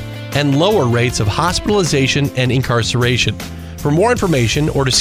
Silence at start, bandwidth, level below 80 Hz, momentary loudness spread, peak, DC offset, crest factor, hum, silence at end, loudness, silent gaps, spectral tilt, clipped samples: 0 s; 16 kHz; -34 dBFS; 5 LU; 0 dBFS; under 0.1%; 14 dB; none; 0 s; -15 LUFS; none; -4.5 dB/octave; under 0.1%